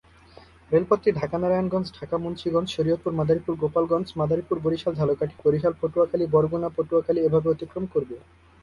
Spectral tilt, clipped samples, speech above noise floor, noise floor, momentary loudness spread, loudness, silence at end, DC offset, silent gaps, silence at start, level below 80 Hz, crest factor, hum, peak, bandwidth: -8.5 dB/octave; under 0.1%; 27 dB; -51 dBFS; 7 LU; -24 LUFS; 0.45 s; under 0.1%; none; 0.7 s; -52 dBFS; 18 dB; none; -6 dBFS; 11 kHz